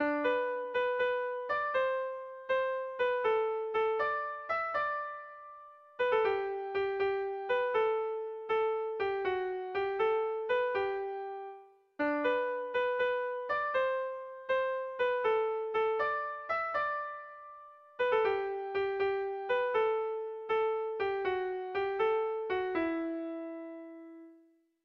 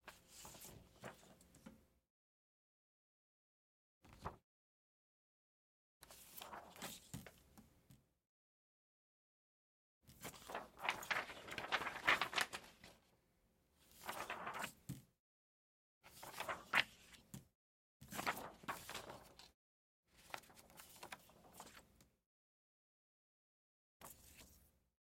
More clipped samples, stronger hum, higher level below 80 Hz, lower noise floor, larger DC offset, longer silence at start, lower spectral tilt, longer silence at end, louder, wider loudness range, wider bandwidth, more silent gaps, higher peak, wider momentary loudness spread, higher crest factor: neither; neither; first, -70 dBFS vs -76 dBFS; second, -65 dBFS vs -79 dBFS; neither; about the same, 0 s vs 0.05 s; first, -5.5 dB/octave vs -2 dB/octave; about the same, 0.5 s vs 0.45 s; first, -33 LUFS vs -45 LUFS; second, 1 LU vs 21 LU; second, 6 kHz vs 16.5 kHz; second, none vs 2.10-4.01 s, 4.44-6.01 s, 8.29-10.01 s, 15.19-16.01 s, 17.55-18.00 s, 19.54-20.03 s, 22.26-24.00 s; about the same, -18 dBFS vs -18 dBFS; second, 12 LU vs 25 LU; second, 14 dB vs 34 dB